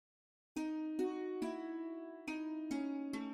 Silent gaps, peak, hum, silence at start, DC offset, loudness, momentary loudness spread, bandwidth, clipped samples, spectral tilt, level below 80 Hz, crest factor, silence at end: none; -28 dBFS; none; 0.55 s; under 0.1%; -42 LUFS; 6 LU; 12.5 kHz; under 0.1%; -5 dB/octave; -78 dBFS; 14 dB; 0 s